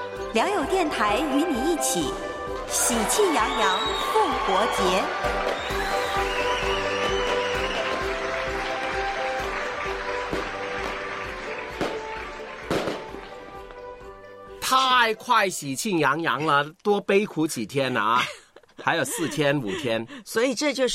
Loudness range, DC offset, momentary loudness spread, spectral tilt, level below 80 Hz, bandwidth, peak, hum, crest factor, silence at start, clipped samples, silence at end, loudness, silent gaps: 7 LU; under 0.1%; 11 LU; -3 dB/octave; -44 dBFS; 16 kHz; -4 dBFS; none; 20 dB; 0 s; under 0.1%; 0 s; -24 LUFS; none